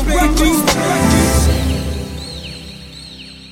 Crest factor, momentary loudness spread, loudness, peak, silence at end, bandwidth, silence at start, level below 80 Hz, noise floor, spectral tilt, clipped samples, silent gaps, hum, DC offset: 16 dB; 19 LU; -14 LUFS; 0 dBFS; 0 s; 17 kHz; 0 s; -20 dBFS; -34 dBFS; -4.5 dB/octave; under 0.1%; none; none; under 0.1%